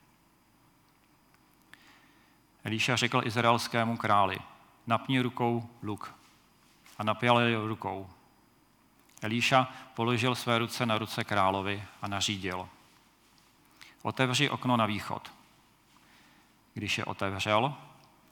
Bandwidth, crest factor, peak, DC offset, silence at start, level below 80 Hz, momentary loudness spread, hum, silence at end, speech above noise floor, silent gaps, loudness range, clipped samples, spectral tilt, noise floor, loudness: 19 kHz; 24 dB; -8 dBFS; under 0.1%; 2.65 s; -74 dBFS; 14 LU; none; 0.45 s; 35 dB; none; 4 LU; under 0.1%; -4.5 dB/octave; -65 dBFS; -30 LUFS